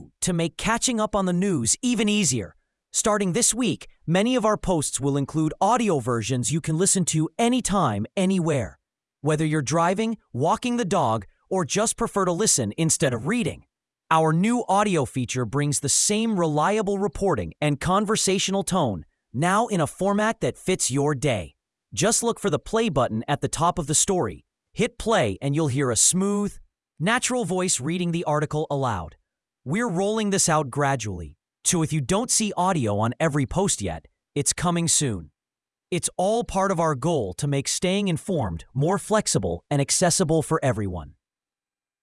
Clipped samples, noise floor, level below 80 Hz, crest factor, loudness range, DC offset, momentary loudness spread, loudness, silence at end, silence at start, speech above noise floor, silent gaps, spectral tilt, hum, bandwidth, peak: under 0.1%; under -90 dBFS; -48 dBFS; 20 dB; 2 LU; under 0.1%; 8 LU; -23 LUFS; 0.9 s; 0 s; over 67 dB; none; -4 dB/octave; none; 12 kHz; -4 dBFS